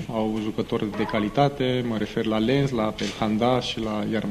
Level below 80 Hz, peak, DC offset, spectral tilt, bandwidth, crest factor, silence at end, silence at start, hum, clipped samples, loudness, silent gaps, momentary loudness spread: -48 dBFS; -6 dBFS; under 0.1%; -6.5 dB/octave; 14 kHz; 18 dB; 0 s; 0 s; none; under 0.1%; -25 LUFS; none; 5 LU